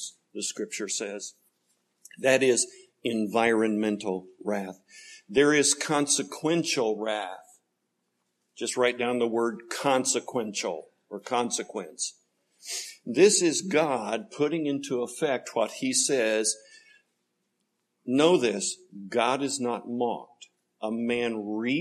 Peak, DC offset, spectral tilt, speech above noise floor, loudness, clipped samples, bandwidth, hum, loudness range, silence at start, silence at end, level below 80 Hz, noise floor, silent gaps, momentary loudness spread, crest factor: -6 dBFS; under 0.1%; -3 dB/octave; 51 dB; -27 LUFS; under 0.1%; 13 kHz; none; 4 LU; 0 s; 0 s; -76 dBFS; -78 dBFS; none; 14 LU; 22 dB